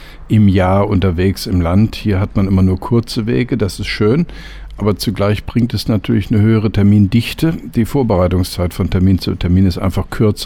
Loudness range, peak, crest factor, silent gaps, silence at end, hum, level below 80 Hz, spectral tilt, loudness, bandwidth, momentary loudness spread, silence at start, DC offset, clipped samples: 2 LU; -2 dBFS; 10 dB; none; 0 s; none; -30 dBFS; -7.5 dB/octave; -15 LUFS; 16 kHz; 6 LU; 0 s; under 0.1%; under 0.1%